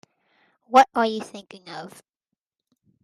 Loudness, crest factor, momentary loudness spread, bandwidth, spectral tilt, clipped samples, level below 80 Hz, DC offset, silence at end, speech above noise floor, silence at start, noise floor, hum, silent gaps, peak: -20 LUFS; 24 dB; 23 LU; 13.5 kHz; -3.5 dB/octave; under 0.1%; -70 dBFS; under 0.1%; 1.15 s; 62 dB; 0.7 s; -84 dBFS; none; none; -2 dBFS